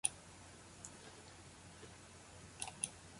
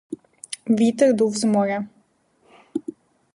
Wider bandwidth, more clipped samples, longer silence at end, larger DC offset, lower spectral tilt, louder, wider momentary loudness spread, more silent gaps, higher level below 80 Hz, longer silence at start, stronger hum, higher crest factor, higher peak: about the same, 11.5 kHz vs 11.5 kHz; neither; second, 0 s vs 0.45 s; neither; second, -1.5 dB/octave vs -5.5 dB/octave; second, -50 LUFS vs -21 LUFS; second, 14 LU vs 19 LU; neither; about the same, -68 dBFS vs -70 dBFS; about the same, 0.05 s vs 0.1 s; neither; first, 34 dB vs 18 dB; second, -18 dBFS vs -6 dBFS